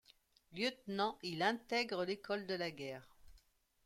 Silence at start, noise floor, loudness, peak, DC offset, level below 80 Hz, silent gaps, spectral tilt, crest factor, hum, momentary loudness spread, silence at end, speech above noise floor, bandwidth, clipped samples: 0.5 s; -71 dBFS; -40 LUFS; -18 dBFS; under 0.1%; -74 dBFS; none; -4.5 dB/octave; 24 dB; none; 11 LU; 0.5 s; 31 dB; 16.5 kHz; under 0.1%